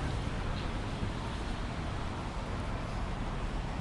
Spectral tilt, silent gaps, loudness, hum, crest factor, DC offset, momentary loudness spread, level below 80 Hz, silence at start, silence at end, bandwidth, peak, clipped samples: -6 dB/octave; none; -38 LUFS; none; 14 dB; under 0.1%; 2 LU; -40 dBFS; 0 s; 0 s; 11.5 kHz; -22 dBFS; under 0.1%